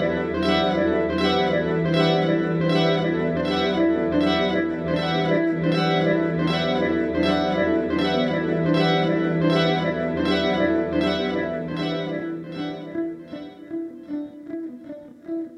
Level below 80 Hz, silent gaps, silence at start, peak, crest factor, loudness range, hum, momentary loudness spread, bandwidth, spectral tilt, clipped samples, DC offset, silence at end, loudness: -48 dBFS; none; 0 s; -6 dBFS; 16 dB; 8 LU; none; 13 LU; 9.6 kHz; -7 dB/octave; under 0.1%; under 0.1%; 0 s; -22 LUFS